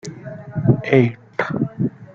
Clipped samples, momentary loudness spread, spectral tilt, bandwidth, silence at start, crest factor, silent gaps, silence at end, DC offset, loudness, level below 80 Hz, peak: under 0.1%; 15 LU; -8 dB/octave; 7.6 kHz; 0.05 s; 18 dB; none; 0.1 s; under 0.1%; -20 LUFS; -50 dBFS; -2 dBFS